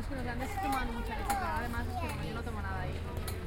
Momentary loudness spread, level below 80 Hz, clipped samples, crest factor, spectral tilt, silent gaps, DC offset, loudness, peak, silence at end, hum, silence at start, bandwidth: 5 LU; -42 dBFS; under 0.1%; 16 dB; -5.5 dB/octave; none; under 0.1%; -36 LUFS; -20 dBFS; 0 s; none; 0 s; 17 kHz